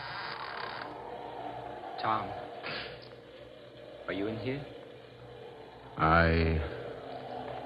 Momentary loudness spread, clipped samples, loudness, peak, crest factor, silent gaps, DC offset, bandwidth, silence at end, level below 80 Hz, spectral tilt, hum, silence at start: 23 LU; under 0.1%; -34 LUFS; -10 dBFS; 24 dB; none; under 0.1%; 5.4 kHz; 0 s; -46 dBFS; -8 dB/octave; none; 0 s